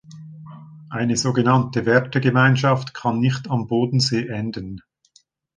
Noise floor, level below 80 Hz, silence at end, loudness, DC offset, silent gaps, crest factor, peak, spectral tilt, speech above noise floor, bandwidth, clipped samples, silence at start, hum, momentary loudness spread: -59 dBFS; -56 dBFS; 0.8 s; -20 LUFS; under 0.1%; none; 18 dB; -2 dBFS; -5.5 dB/octave; 40 dB; 9.8 kHz; under 0.1%; 0.1 s; none; 23 LU